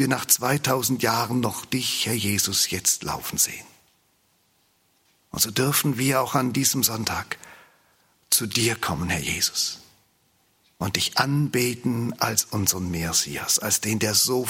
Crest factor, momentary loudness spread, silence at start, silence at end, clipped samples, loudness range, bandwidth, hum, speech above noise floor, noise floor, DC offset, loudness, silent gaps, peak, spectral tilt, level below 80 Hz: 22 dB; 7 LU; 0 s; 0 s; under 0.1%; 3 LU; 16.5 kHz; none; 42 dB; -65 dBFS; under 0.1%; -22 LUFS; none; -2 dBFS; -3 dB/octave; -56 dBFS